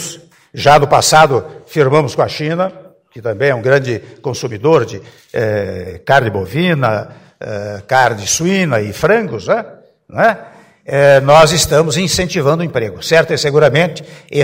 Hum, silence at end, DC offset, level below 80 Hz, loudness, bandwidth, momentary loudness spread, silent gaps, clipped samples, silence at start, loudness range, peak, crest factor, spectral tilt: none; 0 s; under 0.1%; -42 dBFS; -13 LUFS; 16.5 kHz; 15 LU; none; 0.3%; 0 s; 5 LU; 0 dBFS; 14 dB; -4.5 dB/octave